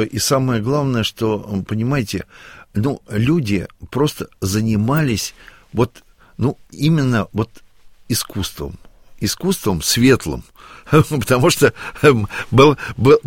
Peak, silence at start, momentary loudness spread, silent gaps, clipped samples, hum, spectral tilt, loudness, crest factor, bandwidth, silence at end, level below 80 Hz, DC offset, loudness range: 0 dBFS; 0 s; 12 LU; none; under 0.1%; none; -5.5 dB/octave; -18 LUFS; 18 dB; 17 kHz; 0.05 s; -42 dBFS; under 0.1%; 6 LU